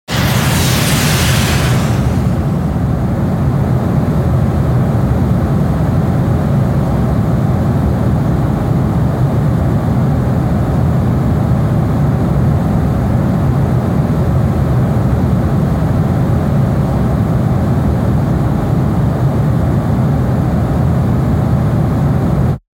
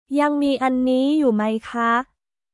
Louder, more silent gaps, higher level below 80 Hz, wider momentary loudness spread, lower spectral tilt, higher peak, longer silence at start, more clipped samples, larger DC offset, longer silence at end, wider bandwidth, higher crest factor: first, -13 LUFS vs -20 LUFS; neither; first, -22 dBFS vs -60 dBFS; second, 2 LU vs 5 LU; about the same, -7 dB/octave vs -6 dB/octave; first, -2 dBFS vs -8 dBFS; about the same, 0.1 s vs 0.1 s; neither; neither; second, 0.15 s vs 0.5 s; first, 17 kHz vs 11.5 kHz; about the same, 12 dB vs 12 dB